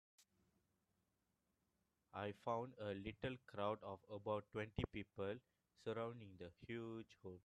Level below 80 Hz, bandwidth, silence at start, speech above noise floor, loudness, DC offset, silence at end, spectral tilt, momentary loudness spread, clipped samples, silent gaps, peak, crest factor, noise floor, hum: -70 dBFS; 11.5 kHz; 0.2 s; 39 dB; -49 LUFS; under 0.1%; 0.05 s; -7 dB/octave; 10 LU; under 0.1%; none; -28 dBFS; 22 dB; -88 dBFS; none